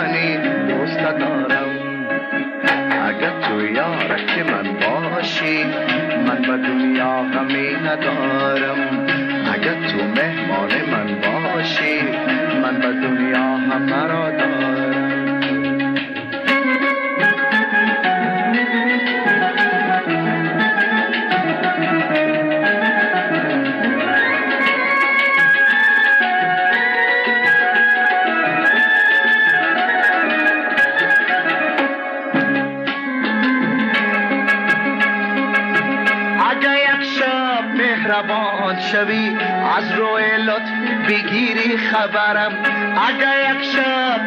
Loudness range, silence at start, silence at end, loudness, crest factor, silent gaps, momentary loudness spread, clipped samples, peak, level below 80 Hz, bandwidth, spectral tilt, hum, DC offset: 5 LU; 0 s; 0 s; -16 LUFS; 10 dB; none; 6 LU; under 0.1%; -8 dBFS; -66 dBFS; 9.2 kHz; -6 dB/octave; none; under 0.1%